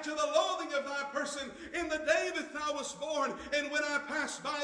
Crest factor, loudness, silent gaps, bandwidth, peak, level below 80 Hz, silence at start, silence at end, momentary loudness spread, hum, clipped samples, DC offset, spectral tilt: 20 dB; -34 LUFS; none; 10.5 kHz; -16 dBFS; -66 dBFS; 0 s; 0 s; 7 LU; none; under 0.1%; under 0.1%; -1.5 dB/octave